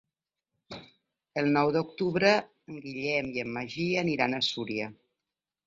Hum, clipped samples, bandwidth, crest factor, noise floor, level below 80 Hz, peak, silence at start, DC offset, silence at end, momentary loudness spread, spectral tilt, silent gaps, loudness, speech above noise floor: none; under 0.1%; 7.8 kHz; 24 dB; -89 dBFS; -66 dBFS; -8 dBFS; 0.7 s; under 0.1%; 0.75 s; 20 LU; -5.5 dB/octave; none; -28 LUFS; 61 dB